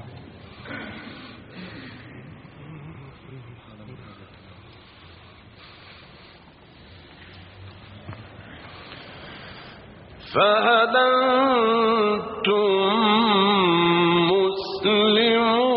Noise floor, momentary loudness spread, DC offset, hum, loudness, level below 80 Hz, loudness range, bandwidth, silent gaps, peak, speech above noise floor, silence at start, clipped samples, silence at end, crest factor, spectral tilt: -49 dBFS; 25 LU; under 0.1%; none; -19 LUFS; -58 dBFS; 24 LU; 5 kHz; none; -6 dBFS; 30 dB; 0 s; under 0.1%; 0 s; 18 dB; -2.5 dB/octave